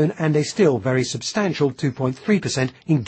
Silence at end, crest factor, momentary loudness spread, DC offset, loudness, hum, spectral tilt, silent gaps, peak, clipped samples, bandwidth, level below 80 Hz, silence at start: 0 s; 16 dB; 5 LU; under 0.1%; -21 LUFS; none; -5.5 dB/octave; none; -6 dBFS; under 0.1%; 8.8 kHz; -58 dBFS; 0 s